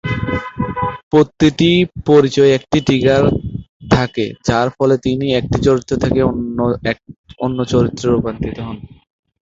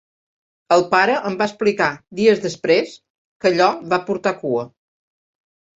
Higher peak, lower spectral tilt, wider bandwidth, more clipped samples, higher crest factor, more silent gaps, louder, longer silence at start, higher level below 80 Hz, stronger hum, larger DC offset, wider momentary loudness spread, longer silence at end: about the same, 0 dBFS vs -2 dBFS; first, -6.5 dB/octave vs -5 dB/octave; about the same, 7.8 kHz vs 8 kHz; neither; about the same, 14 dB vs 18 dB; about the same, 1.03-1.11 s, 3.69-3.80 s, 7.18-7.24 s vs 3.10-3.40 s; first, -15 LUFS vs -18 LUFS; second, 0.05 s vs 0.7 s; first, -36 dBFS vs -62 dBFS; neither; neither; first, 11 LU vs 7 LU; second, 0.6 s vs 1.1 s